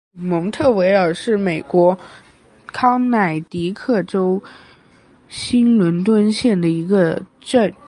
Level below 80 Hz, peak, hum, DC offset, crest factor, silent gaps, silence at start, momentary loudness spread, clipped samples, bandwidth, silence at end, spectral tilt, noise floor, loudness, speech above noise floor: -52 dBFS; -2 dBFS; none; under 0.1%; 16 dB; none; 0.15 s; 9 LU; under 0.1%; 11 kHz; 0.15 s; -6.5 dB/octave; -50 dBFS; -17 LUFS; 34 dB